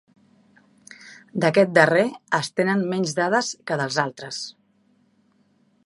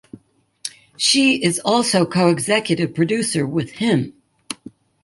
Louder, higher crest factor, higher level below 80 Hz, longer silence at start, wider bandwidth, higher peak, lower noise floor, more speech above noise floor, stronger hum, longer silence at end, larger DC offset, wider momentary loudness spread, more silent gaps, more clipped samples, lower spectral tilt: second, -22 LUFS vs -18 LUFS; first, 24 dB vs 18 dB; second, -72 dBFS vs -60 dBFS; first, 1 s vs 0.65 s; about the same, 11.5 kHz vs 12 kHz; about the same, 0 dBFS vs -2 dBFS; first, -63 dBFS vs -54 dBFS; first, 41 dB vs 36 dB; neither; first, 1.35 s vs 0.5 s; neither; about the same, 16 LU vs 17 LU; neither; neither; about the same, -4.5 dB/octave vs -4 dB/octave